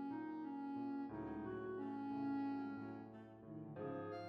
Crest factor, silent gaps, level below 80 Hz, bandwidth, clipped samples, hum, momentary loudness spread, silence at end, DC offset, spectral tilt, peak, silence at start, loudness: 12 dB; none; -76 dBFS; 6 kHz; under 0.1%; none; 11 LU; 0 s; under 0.1%; -9 dB/octave; -36 dBFS; 0 s; -47 LUFS